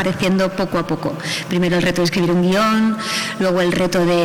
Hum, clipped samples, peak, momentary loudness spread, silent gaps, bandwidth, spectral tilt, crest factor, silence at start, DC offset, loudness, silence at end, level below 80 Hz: none; under 0.1%; -8 dBFS; 6 LU; none; 18 kHz; -5.5 dB/octave; 8 dB; 0 s; under 0.1%; -17 LUFS; 0 s; -44 dBFS